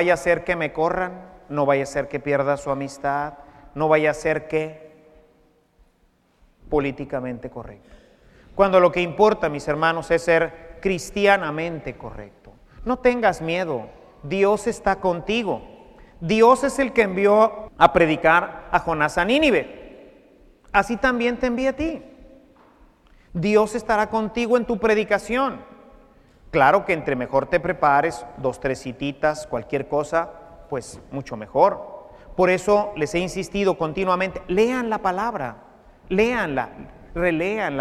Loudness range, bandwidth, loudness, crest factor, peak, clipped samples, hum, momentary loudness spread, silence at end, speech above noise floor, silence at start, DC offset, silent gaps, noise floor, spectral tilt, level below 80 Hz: 6 LU; 14 kHz; -21 LUFS; 22 dB; 0 dBFS; under 0.1%; none; 15 LU; 0 s; 41 dB; 0 s; under 0.1%; none; -62 dBFS; -5.5 dB/octave; -46 dBFS